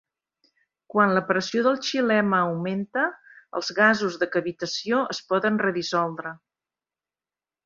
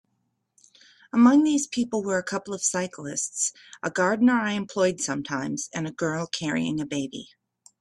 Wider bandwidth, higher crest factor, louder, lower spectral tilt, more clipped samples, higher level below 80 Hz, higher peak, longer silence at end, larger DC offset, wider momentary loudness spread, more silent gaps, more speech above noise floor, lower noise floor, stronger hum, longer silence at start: second, 7.6 kHz vs 12 kHz; about the same, 22 dB vs 18 dB; about the same, -24 LUFS vs -25 LUFS; about the same, -5 dB/octave vs -4 dB/octave; neither; about the same, -70 dBFS vs -68 dBFS; first, -4 dBFS vs -8 dBFS; first, 1.3 s vs 0.55 s; neither; about the same, 9 LU vs 11 LU; neither; first, over 66 dB vs 50 dB; first, under -90 dBFS vs -75 dBFS; neither; second, 0.95 s vs 1.15 s